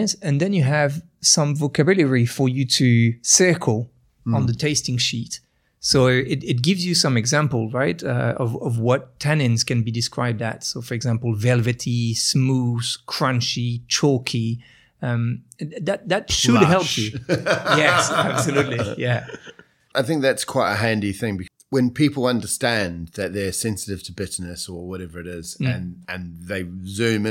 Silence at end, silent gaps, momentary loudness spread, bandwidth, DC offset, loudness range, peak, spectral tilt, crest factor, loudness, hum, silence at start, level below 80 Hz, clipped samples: 0 s; none; 13 LU; 16.5 kHz; under 0.1%; 5 LU; 0 dBFS; -4.5 dB/octave; 20 dB; -20 LUFS; none; 0 s; -52 dBFS; under 0.1%